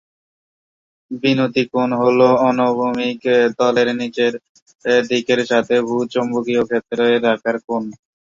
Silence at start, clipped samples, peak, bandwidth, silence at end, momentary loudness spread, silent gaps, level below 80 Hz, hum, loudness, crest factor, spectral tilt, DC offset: 1.1 s; under 0.1%; -2 dBFS; 7.6 kHz; 0.4 s; 7 LU; 4.49-4.55 s, 4.62-4.66 s, 4.75-4.79 s, 7.64-7.68 s; -62 dBFS; none; -17 LUFS; 16 dB; -5.5 dB/octave; under 0.1%